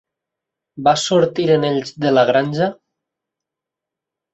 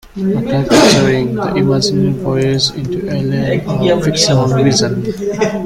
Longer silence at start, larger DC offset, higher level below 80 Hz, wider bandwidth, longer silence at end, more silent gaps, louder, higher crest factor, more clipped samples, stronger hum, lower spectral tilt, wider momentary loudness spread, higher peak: first, 0.75 s vs 0.05 s; neither; second, -58 dBFS vs -38 dBFS; second, 8.2 kHz vs 15.5 kHz; first, 1.6 s vs 0 s; neither; second, -17 LUFS vs -13 LUFS; about the same, 18 dB vs 14 dB; neither; neither; about the same, -5 dB/octave vs -5 dB/octave; about the same, 6 LU vs 8 LU; about the same, -2 dBFS vs 0 dBFS